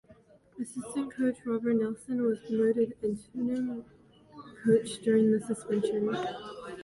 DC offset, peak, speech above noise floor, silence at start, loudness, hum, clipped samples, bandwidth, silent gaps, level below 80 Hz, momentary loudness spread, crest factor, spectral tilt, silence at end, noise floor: under 0.1%; -12 dBFS; 29 dB; 0.1 s; -30 LUFS; none; under 0.1%; 11.5 kHz; none; -68 dBFS; 12 LU; 18 dB; -6.5 dB/octave; 0 s; -59 dBFS